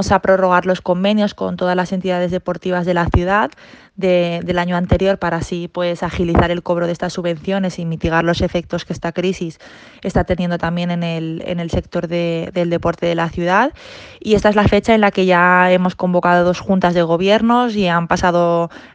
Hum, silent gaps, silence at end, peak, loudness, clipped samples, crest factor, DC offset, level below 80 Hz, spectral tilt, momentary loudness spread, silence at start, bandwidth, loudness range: none; none; 0.1 s; 0 dBFS; -16 LUFS; under 0.1%; 16 dB; under 0.1%; -36 dBFS; -6.5 dB/octave; 9 LU; 0 s; 8.8 kHz; 7 LU